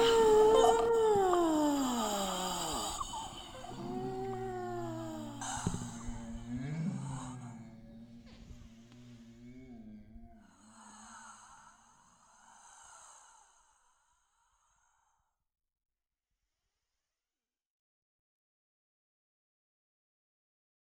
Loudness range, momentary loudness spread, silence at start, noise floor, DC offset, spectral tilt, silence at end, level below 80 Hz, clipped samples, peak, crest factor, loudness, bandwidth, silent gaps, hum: 24 LU; 28 LU; 0 s; under -90 dBFS; under 0.1%; -4.5 dB/octave; 7.75 s; -56 dBFS; under 0.1%; -14 dBFS; 24 dB; -33 LUFS; 19 kHz; none; none